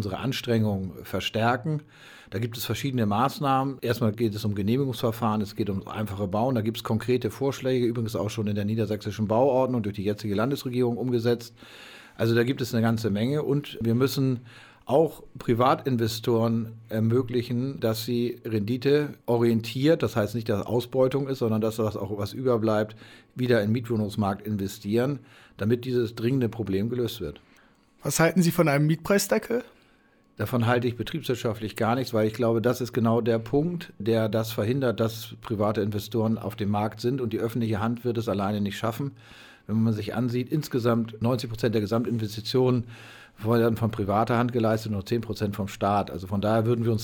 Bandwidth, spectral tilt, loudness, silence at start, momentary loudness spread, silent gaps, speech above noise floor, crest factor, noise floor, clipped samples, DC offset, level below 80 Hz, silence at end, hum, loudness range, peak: 19.5 kHz; -6.5 dB/octave; -26 LUFS; 0 s; 8 LU; none; 35 dB; 18 dB; -61 dBFS; under 0.1%; under 0.1%; -58 dBFS; 0 s; none; 2 LU; -8 dBFS